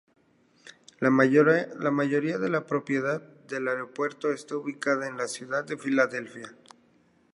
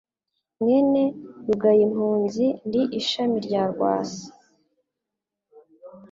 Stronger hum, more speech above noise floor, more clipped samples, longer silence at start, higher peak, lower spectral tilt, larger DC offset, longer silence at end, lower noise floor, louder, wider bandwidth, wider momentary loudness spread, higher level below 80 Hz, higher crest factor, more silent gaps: neither; second, 37 dB vs 64 dB; neither; about the same, 0.65 s vs 0.6 s; about the same, -6 dBFS vs -8 dBFS; about the same, -6 dB/octave vs -6 dB/octave; neither; first, 0.8 s vs 0.05 s; second, -63 dBFS vs -85 dBFS; second, -27 LUFS vs -22 LUFS; first, 11.5 kHz vs 7.6 kHz; first, 14 LU vs 8 LU; second, -78 dBFS vs -64 dBFS; first, 22 dB vs 16 dB; neither